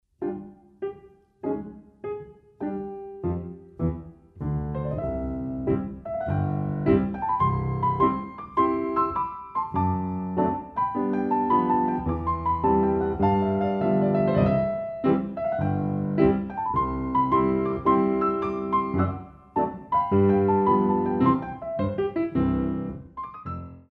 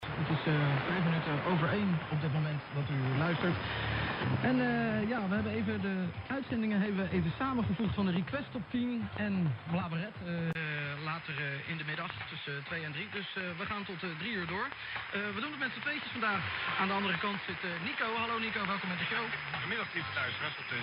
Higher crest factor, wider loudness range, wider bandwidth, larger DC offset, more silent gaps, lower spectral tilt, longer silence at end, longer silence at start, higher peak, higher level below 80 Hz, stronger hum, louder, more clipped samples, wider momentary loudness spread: about the same, 18 dB vs 18 dB; first, 9 LU vs 5 LU; about the same, 5 kHz vs 5.4 kHz; neither; neither; first, -11 dB/octave vs -9 dB/octave; about the same, 0.1 s vs 0 s; first, 0.2 s vs 0 s; first, -6 dBFS vs -16 dBFS; first, -44 dBFS vs -58 dBFS; neither; first, -25 LUFS vs -34 LUFS; neither; first, 14 LU vs 7 LU